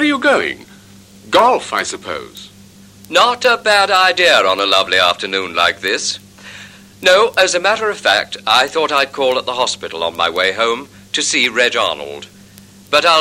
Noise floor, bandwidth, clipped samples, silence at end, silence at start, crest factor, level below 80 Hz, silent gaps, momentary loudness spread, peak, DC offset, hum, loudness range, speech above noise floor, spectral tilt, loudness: -42 dBFS; 16 kHz; under 0.1%; 0 s; 0 s; 16 dB; -56 dBFS; none; 14 LU; 0 dBFS; under 0.1%; none; 4 LU; 27 dB; -1.5 dB/octave; -14 LUFS